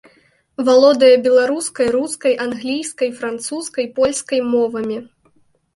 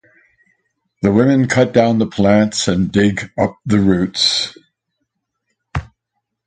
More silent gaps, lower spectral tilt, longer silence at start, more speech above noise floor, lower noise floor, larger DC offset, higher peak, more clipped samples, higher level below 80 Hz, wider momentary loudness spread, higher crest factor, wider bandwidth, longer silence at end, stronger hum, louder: neither; second, -3 dB/octave vs -5 dB/octave; second, 0.6 s vs 1 s; second, 41 dB vs 61 dB; second, -57 dBFS vs -75 dBFS; neither; about the same, -2 dBFS vs 0 dBFS; neither; second, -58 dBFS vs -42 dBFS; about the same, 13 LU vs 12 LU; about the same, 16 dB vs 16 dB; first, 11.5 kHz vs 9.4 kHz; about the same, 0.7 s vs 0.6 s; neither; about the same, -16 LUFS vs -15 LUFS